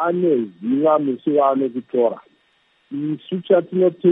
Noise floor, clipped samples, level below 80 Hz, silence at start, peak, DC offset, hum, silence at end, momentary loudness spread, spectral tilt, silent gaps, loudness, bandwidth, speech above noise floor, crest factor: -62 dBFS; under 0.1%; -76 dBFS; 0 s; -4 dBFS; under 0.1%; none; 0 s; 10 LU; -11 dB/octave; none; -19 LUFS; 3.9 kHz; 43 dB; 16 dB